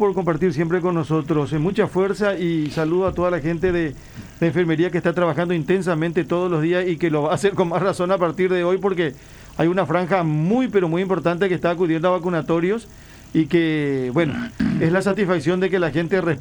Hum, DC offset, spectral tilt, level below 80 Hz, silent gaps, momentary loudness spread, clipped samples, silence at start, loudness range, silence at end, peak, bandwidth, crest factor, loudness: none; under 0.1%; -7.5 dB/octave; -46 dBFS; none; 3 LU; under 0.1%; 0 s; 1 LU; 0 s; -4 dBFS; over 20 kHz; 16 dB; -20 LUFS